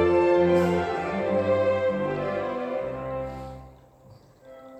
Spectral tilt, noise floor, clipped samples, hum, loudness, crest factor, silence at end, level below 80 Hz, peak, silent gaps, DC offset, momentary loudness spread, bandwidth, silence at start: -7.5 dB/octave; -52 dBFS; under 0.1%; none; -25 LUFS; 16 dB; 0 s; -52 dBFS; -10 dBFS; none; under 0.1%; 14 LU; 8.6 kHz; 0 s